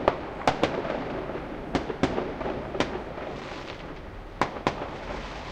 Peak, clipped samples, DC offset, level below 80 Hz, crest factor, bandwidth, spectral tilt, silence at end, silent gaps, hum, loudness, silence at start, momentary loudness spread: -4 dBFS; under 0.1%; under 0.1%; -44 dBFS; 26 dB; 16 kHz; -5.5 dB/octave; 0 s; none; none; -31 LUFS; 0 s; 10 LU